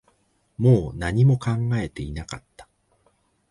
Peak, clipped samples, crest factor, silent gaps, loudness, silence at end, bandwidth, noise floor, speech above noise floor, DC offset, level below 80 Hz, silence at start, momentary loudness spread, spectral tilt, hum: -4 dBFS; under 0.1%; 18 dB; none; -22 LUFS; 0.9 s; 11 kHz; -65 dBFS; 44 dB; under 0.1%; -44 dBFS; 0.6 s; 18 LU; -8 dB/octave; none